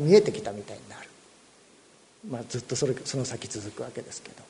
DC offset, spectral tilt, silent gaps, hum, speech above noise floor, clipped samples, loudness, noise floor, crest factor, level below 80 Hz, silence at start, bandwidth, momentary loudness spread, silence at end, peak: under 0.1%; -5 dB/octave; none; none; 30 dB; under 0.1%; -30 LUFS; -57 dBFS; 24 dB; -66 dBFS; 0 s; 10.5 kHz; 20 LU; 0.05 s; -6 dBFS